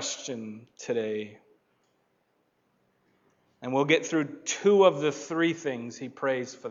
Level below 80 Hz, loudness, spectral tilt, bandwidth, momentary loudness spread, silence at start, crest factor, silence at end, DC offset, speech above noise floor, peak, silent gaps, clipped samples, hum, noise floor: -84 dBFS; -27 LUFS; -4 dB/octave; 7.8 kHz; 18 LU; 0 s; 22 dB; 0 s; under 0.1%; 45 dB; -8 dBFS; none; under 0.1%; none; -72 dBFS